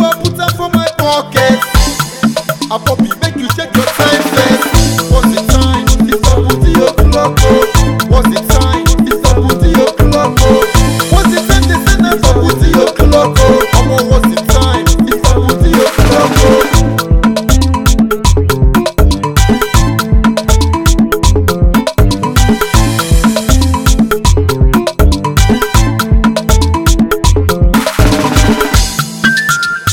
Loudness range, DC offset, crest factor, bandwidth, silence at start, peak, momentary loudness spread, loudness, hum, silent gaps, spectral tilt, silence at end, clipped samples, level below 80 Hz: 2 LU; 0.2%; 8 dB; 19 kHz; 0 s; 0 dBFS; 3 LU; -10 LUFS; none; none; -5 dB/octave; 0 s; 2%; -14 dBFS